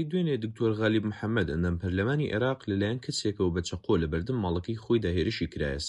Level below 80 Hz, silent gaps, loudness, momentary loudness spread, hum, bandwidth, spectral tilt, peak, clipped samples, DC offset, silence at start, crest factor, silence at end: -46 dBFS; none; -29 LUFS; 4 LU; none; 11.5 kHz; -6 dB/octave; -14 dBFS; under 0.1%; under 0.1%; 0 s; 16 dB; 0 s